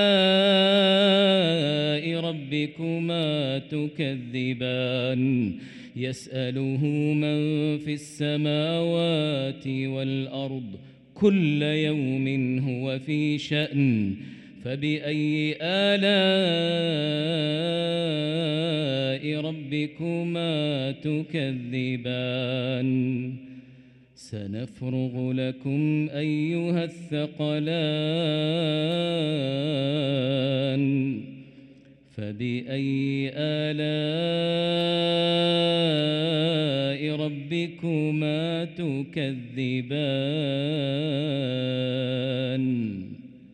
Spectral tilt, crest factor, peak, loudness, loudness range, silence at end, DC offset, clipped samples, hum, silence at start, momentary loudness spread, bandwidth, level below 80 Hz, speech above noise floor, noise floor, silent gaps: -7 dB/octave; 16 dB; -8 dBFS; -25 LUFS; 5 LU; 0.15 s; under 0.1%; under 0.1%; none; 0 s; 9 LU; 11 kHz; -68 dBFS; 27 dB; -53 dBFS; none